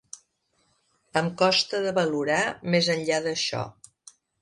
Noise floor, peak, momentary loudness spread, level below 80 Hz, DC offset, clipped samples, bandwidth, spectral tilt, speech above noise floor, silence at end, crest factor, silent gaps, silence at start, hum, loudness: -70 dBFS; -8 dBFS; 12 LU; -66 dBFS; under 0.1%; under 0.1%; 11.5 kHz; -4 dB/octave; 46 dB; 0.7 s; 20 dB; none; 0.15 s; none; -25 LUFS